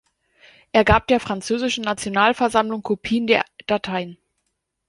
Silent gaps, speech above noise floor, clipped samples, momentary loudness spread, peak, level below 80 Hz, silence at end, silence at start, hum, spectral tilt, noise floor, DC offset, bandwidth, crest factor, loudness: none; 55 dB; under 0.1%; 8 LU; -2 dBFS; -40 dBFS; 0.75 s; 0.75 s; none; -4.5 dB/octave; -75 dBFS; under 0.1%; 11.5 kHz; 20 dB; -20 LUFS